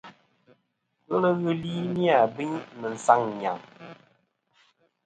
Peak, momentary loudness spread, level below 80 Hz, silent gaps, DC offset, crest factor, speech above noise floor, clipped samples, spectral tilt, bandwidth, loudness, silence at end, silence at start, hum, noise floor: -2 dBFS; 16 LU; -70 dBFS; none; under 0.1%; 24 dB; 49 dB; under 0.1%; -6.5 dB/octave; 9.2 kHz; -26 LUFS; 1.1 s; 0.05 s; none; -75 dBFS